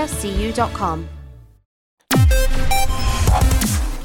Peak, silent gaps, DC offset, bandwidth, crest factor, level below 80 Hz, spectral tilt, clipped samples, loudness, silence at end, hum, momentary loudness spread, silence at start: -4 dBFS; 1.65-1.98 s; under 0.1%; 19 kHz; 14 dB; -20 dBFS; -4.5 dB/octave; under 0.1%; -19 LUFS; 0 s; none; 8 LU; 0 s